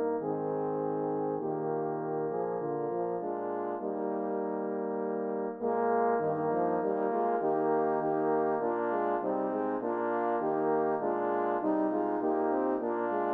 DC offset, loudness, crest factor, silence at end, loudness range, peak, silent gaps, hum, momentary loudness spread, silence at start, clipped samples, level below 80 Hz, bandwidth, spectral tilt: under 0.1%; -31 LUFS; 14 dB; 0 s; 4 LU; -16 dBFS; none; none; 5 LU; 0 s; under 0.1%; -80 dBFS; 3.7 kHz; -10.5 dB/octave